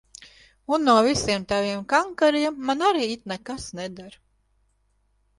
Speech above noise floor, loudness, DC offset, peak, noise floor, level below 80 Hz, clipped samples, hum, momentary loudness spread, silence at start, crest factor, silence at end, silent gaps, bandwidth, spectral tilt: 44 dB; -23 LUFS; under 0.1%; -4 dBFS; -67 dBFS; -54 dBFS; under 0.1%; 50 Hz at -50 dBFS; 16 LU; 0.2 s; 20 dB; 1.3 s; none; 11.5 kHz; -4 dB/octave